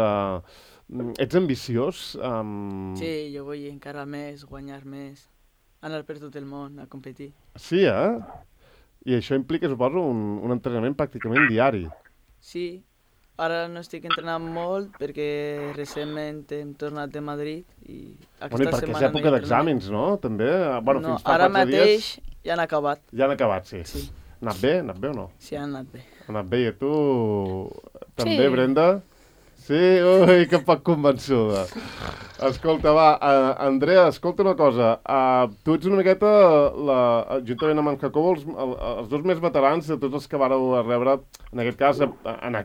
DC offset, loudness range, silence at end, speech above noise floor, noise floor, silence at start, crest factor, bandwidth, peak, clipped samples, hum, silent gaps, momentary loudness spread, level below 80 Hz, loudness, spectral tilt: under 0.1%; 12 LU; 0 s; 39 dB; -61 dBFS; 0 s; 20 dB; 16 kHz; -4 dBFS; under 0.1%; none; none; 18 LU; -50 dBFS; -22 LUFS; -6.5 dB/octave